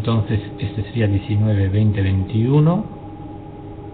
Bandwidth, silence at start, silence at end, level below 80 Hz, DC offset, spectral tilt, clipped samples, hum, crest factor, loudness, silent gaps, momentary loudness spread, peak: 4.4 kHz; 0 s; 0 s; -42 dBFS; under 0.1%; -13 dB/octave; under 0.1%; none; 14 dB; -19 LUFS; none; 19 LU; -4 dBFS